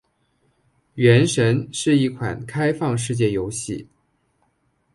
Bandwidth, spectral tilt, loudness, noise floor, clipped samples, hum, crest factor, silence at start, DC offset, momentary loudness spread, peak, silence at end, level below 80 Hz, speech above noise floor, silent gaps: 11.5 kHz; -5.5 dB/octave; -20 LUFS; -67 dBFS; under 0.1%; none; 18 dB; 0.95 s; under 0.1%; 13 LU; -2 dBFS; 1.1 s; -52 dBFS; 47 dB; none